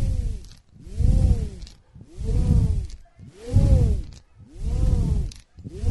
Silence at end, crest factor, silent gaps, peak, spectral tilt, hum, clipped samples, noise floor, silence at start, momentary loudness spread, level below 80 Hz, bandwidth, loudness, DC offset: 0 s; 16 dB; none; -6 dBFS; -8.5 dB/octave; none; under 0.1%; -46 dBFS; 0 s; 22 LU; -24 dBFS; 11.5 kHz; -24 LUFS; under 0.1%